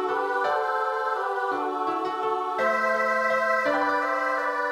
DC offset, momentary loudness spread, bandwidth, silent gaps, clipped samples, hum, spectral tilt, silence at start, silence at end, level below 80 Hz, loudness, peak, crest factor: under 0.1%; 4 LU; 16 kHz; none; under 0.1%; none; -3.5 dB/octave; 0 s; 0 s; -70 dBFS; -25 LUFS; -12 dBFS; 14 dB